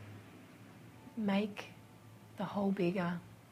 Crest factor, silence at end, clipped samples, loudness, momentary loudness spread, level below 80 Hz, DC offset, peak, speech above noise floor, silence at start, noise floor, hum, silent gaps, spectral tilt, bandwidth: 18 dB; 0 s; under 0.1%; -37 LUFS; 22 LU; -74 dBFS; under 0.1%; -22 dBFS; 21 dB; 0 s; -57 dBFS; none; none; -7.5 dB/octave; 15 kHz